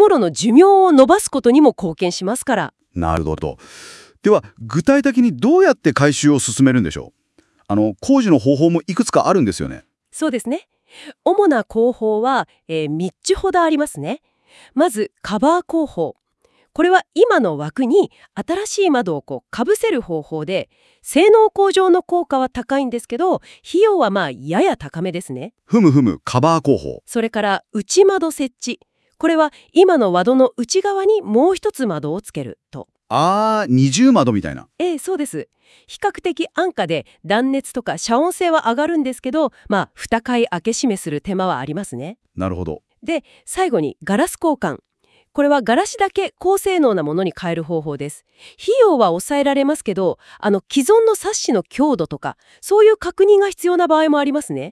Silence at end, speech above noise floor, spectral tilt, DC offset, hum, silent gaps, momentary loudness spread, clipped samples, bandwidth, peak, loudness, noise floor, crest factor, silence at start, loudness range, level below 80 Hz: 0 s; 44 dB; -5.5 dB/octave; under 0.1%; none; none; 13 LU; under 0.1%; 12 kHz; 0 dBFS; -17 LUFS; -60 dBFS; 16 dB; 0 s; 5 LU; -50 dBFS